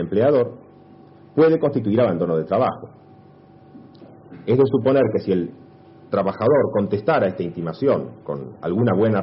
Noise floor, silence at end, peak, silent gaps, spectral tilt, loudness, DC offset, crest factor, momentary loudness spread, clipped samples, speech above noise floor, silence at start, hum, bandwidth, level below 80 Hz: -47 dBFS; 0 s; -4 dBFS; none; -7.5 dB/octave; -20 LUFS; under 0.1%; 16 dB; 11 LU; under 0.1%; 28 dB; 0 s; none; 5.8 kHz; -60 dBFS